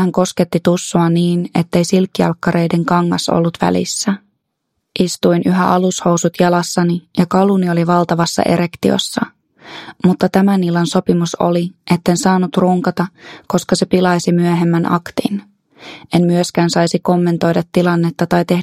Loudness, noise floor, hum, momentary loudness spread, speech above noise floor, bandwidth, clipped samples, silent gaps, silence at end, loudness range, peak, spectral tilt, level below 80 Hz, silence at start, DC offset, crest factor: -15 LUFS; -72 dBFS; none; 7 LU; 58 dB; 14 kHz; under 0.1%; none; 0 s; 2 LU; 0 dBFS; -6 dB/octave; -50 dBFS; 0 s; under 0.1%; 14 dB